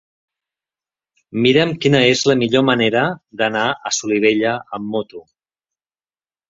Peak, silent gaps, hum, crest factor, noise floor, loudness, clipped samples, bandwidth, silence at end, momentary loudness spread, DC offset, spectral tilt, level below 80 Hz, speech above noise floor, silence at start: 0 dBFS; none; none; 18 dB; under -90 dBFS; -16 LUFS; under 0.1%; 7.8 kHz; 1.3 s; 11 LU; under 0.1%; -4.5 dB/octave; -58 dBFS; over 73 dB; 1.35 s